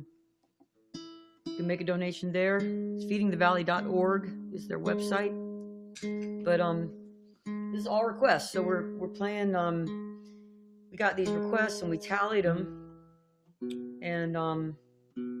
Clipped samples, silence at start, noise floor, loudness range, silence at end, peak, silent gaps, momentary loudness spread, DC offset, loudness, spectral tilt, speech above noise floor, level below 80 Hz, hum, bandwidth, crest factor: under 0.1%; 0 s; -70 dBFS; 4 LU; 0 s; -12 dBFS; none; 18 LU; under 0.1%; -31 LUFS; -6 dB/octave; 40 dB; -70 dBFS; none; 15 kHz; 20 dB